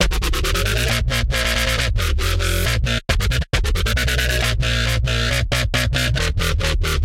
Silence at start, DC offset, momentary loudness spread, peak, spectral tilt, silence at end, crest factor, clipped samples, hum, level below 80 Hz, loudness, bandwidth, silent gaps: 0 s; under 0.1%; 2 LU; -2 dBFS; -3.5 dB/octave; 0 s; 16 dB; under 0.1%; none; -22 dBFS; -19 LUFS; 16.5 kHz; none